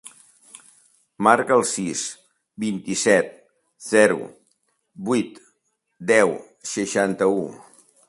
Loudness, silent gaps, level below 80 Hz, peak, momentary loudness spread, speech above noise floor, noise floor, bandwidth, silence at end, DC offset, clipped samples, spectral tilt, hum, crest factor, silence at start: -21 LUFS; none; -66 dBFS; 0 dBFS; 15 LU; 52 dB; -72 dBFS; 11.5 kHz; 0.45 s; under 0.1%; under 0.1%; -4 dB/octave; none; 22 dB; 0.05 s